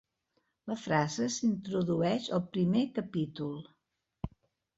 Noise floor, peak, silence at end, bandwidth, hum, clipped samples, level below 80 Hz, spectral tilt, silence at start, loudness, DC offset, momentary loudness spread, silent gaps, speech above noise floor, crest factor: -78 dBFS; -14 dBFS; 0.5 s; 8 kHz; none; under 0.1%; -60 dBFS; -5.5 dB/octave; 0.65 s; -32 LUFS; under 0.1%; 15 LU; none; 47 dB; 20 dB